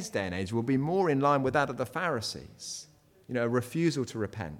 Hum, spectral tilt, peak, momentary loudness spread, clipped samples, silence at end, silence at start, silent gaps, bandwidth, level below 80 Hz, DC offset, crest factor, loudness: none; -5.5 dB/octave; -14 dBFS; 14 LU; under 0.1%; 0 s; 0 s; none; 16.5 kHz; -62 dBFS; under 0.1%; 16 dB; -30 LUFS